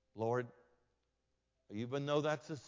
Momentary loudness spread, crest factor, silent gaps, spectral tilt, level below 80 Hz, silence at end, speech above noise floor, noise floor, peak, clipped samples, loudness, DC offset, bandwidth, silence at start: 13 LU; 20 dB; none; -6 dB/octave; -80 dBFS; 0 s; 46 dB; -84 dBFS; -22 dBFS; under 0.1%; -39 LUFS; under 0.1%; 7.6 kHz; 0.15 s